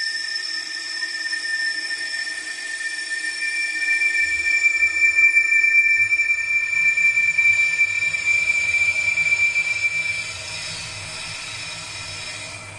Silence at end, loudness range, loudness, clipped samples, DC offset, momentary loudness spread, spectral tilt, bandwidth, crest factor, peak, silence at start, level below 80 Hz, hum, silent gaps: 0 s; 9 LU; -18 LUFS; under 0.1%; under 0.1%; 15 LU; 0.5 dB/octave; 11.5 kHz; 16 dB; -6 dBFS; 0 s; -58 dBFS; none; none